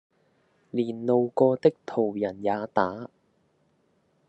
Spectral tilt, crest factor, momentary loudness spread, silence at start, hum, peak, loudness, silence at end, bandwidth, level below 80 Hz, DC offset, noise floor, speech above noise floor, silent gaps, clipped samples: -8.5 dB/octave; 22 dB; 10 LU; 0.75 s; none; -6 dBFS; -26 LUFS; 1.25 s; 8.2 kHz; -78 dBFS; under 0.1%; -68 dBFS; 43 dB; none; under 0.1%